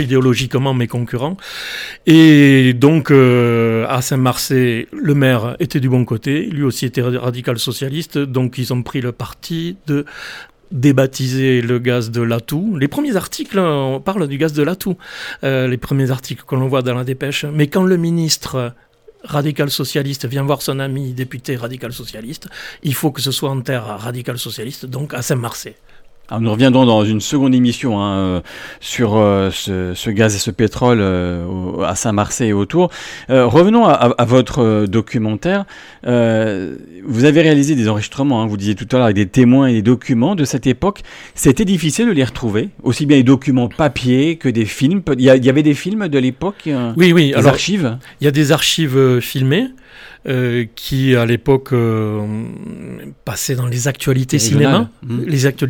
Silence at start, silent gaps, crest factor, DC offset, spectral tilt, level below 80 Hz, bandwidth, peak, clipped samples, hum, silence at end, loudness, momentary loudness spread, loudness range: 0 s; none; 14 dB; under 0.1%; -6 dB/octave; -44 dBFS; 18.5 kHz; 0 dBFS; under 0.1%; none; 0 s; -15 LUFS; 14 LU; 7 LU